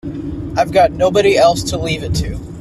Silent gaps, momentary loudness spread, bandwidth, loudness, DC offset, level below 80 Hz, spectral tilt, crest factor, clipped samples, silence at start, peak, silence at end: none; 13 LU; 13.5 kHz; -14 LUFS; under 0.1%; -32 dBFS; -5 dB/octave; 14 dB; under 0.1%; 0.05 s; 0 dBFS; 0 s